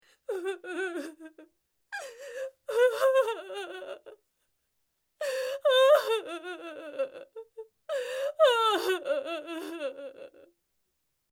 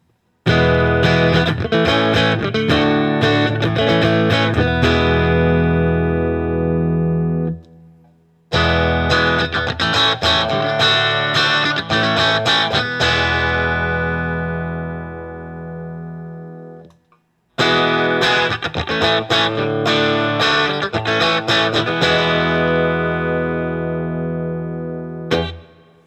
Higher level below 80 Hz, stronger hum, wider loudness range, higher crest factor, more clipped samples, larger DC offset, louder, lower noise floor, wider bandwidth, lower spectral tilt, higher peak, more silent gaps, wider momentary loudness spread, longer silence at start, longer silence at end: second, -86 dBFS vs -38 dBFS; neither; second, 3 LU vs 6 LU; about the same, 20 dB vs 16 dB; neither; neither; second, -29 LUFS vs -16 LUFS; first, -78 dBFS vs -59 dBFS; first, 17 kHz vs 9 kHz; second, -1 dB/octave vs -5.5 dB/octave; second, -12 dBFS vs 0 dBFS; neither; first, 21 LU vs 12 LU; second, 0.3 s vs 0.45 s; first, 1.05 s vs 0.45 s